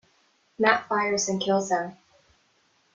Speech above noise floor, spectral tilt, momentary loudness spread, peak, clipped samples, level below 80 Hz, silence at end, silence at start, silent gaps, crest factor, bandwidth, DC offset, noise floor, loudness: 42 dB; -3 dB/octave; 6 LU; -4 dBFS; under 0.1%; -70 dBFS; 1 s; 0.6 s; none; 24 dB; 9.4 kHz; under 0.1%; -66 dBFS; -24 LUFS